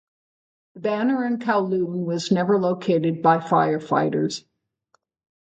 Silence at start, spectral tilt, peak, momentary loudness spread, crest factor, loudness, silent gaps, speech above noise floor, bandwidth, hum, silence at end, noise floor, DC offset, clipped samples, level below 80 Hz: 0.75 s; -6.5 dB/octave; -6 dBFS; 7 LU; 18 dB; -22 LUFS; none; 47 dB; 9 kHz; none; 1.05 s; -68 dBFS; under 0.1%; under 0.1%; -70 dBFS